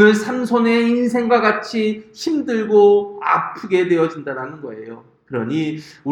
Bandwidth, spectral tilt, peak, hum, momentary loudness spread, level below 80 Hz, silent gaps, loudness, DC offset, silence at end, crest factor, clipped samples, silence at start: 11.5 kHz; -6 dB/octave; 0 dBFS; none; 15 LU; -64 dBFS; none; -18 LUFS; under 0.1%; 0 s; 18 dB; under 0.1%; 0 s